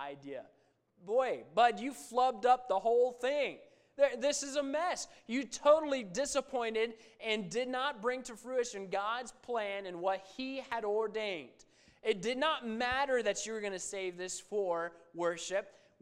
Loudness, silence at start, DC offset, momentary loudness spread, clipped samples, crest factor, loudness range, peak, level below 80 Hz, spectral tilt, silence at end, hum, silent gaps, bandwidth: -34 LUFS; 0 s; under 0.1%; 11 LU; under 0.1%; 20 dB; 5 LU; -14 dBFS; -70 dBFS; -2.5 dB/octave; 0.3 s; none; none; 15 kHz